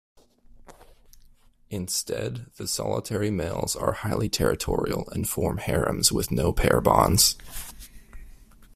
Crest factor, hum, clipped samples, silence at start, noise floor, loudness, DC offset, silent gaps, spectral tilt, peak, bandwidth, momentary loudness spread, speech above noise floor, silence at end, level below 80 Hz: 24 dB; none; under 0.1%; 0.7 s; -55 dBFS; -25 LUFS; under 0.1%; none; -4 dB/octave; -4 dBFS; 16 kHz; 15 LU; 30 dB; 0.1 s; -40 dBFS